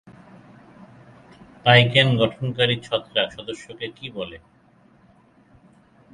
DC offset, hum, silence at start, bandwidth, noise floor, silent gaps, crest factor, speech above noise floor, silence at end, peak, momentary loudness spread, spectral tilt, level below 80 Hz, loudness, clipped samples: under 0.1%; none; 1.65 s; 10.5 kHz; -56 dBFS; none; 24 dB; 35 dB; 1.75 s; 0 dBFS; 20 LU; -6 dB/octave; -58 dBFS; -20 LUFS; under 0.1%